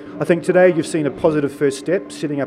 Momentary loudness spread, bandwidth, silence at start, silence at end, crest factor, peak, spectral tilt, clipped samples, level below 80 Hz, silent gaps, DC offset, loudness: 8 LU; 13 kHz; 0 s; 0 s; 16 dB; -2 dBFS; -6 dB/octave; under 0.1%; -54 dBFS; none; under 0.1%; -18 LUFS